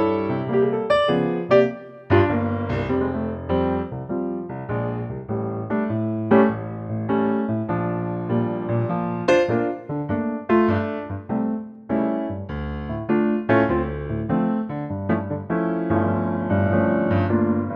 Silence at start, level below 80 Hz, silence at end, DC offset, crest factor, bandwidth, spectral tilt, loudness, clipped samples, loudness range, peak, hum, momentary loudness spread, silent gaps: 0 s; -44 dBFS; 0 s; under 0.1%; 18 dB; 8.2 kHz; -8.5 dB/octave; -23 LUFS; under 0.1%; 3 LU; -4 dBFS; none; 10 LU; none